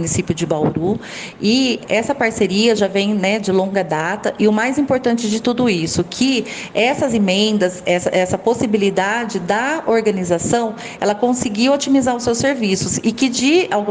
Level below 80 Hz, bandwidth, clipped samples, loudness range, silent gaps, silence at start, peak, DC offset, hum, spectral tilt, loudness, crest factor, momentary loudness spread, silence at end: -50 dBFS; 10 kHz; under 0.1%; 1 LU; none; 0 s; -2 dBFS; under 0.1%; none; -4.5 dB/octave; -17 LUFS; 16 dB; 5 LU; 0 s